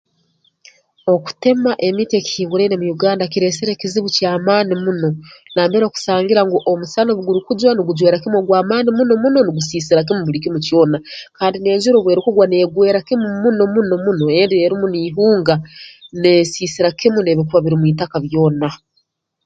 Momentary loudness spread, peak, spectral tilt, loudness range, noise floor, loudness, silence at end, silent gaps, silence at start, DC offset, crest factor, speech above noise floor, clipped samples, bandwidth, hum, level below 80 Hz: 7 LU; 0 dBFS; -6 dB/octave; 2 LU; -65 dBFS; -15 LUFS; 0.7 s; none; 1.05 s; under 0.1%; 14 dB; 50 dB; under 0.1%; 9 kHz; none; -54 dBFS